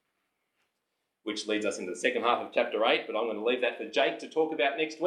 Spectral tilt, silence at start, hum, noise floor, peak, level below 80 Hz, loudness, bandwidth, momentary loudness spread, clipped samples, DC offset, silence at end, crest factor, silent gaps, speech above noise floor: -3 dB/octave; 1.25 s; none; -82 dBFS; -10 dBFS; under -90 dBFS; -29 LUFS; 11 kHz; 6 LU; under 0.1%; under 0.1%; 0 s; 20 dB; none; 53 dB